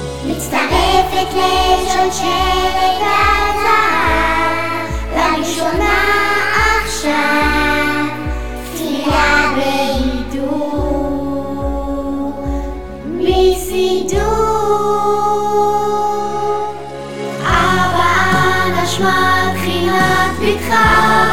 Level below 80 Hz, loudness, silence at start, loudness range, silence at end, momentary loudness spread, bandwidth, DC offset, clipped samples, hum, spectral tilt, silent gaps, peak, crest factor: -28 dBFS; -14 LUFS; 0 s; 4 LU; 0 s; 9 LU; 18.5 kHz; 4%; under 0.1%; none; -4 dB/octave; none; -2 dBFS; 14 dB